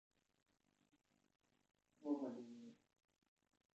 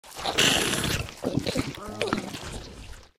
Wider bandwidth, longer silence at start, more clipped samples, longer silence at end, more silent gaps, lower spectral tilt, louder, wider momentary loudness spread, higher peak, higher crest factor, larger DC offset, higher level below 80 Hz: second, 8.2 kHz vs 16.5 kHz; first, 2 s vs 0.05 s; neither; first, 1.05 s vs 0.1 s; neither; first, -7 dB/octave vs -3 dB/octave; second, -49 LUFS vs -26 LUFS; about the same, 16 LU vs 18 LU; second, -32 dBFS vs -8 dBFS; about the same, 24 dB vs 20 dB; neither; second, under -90 dBFS vs -46 dBFS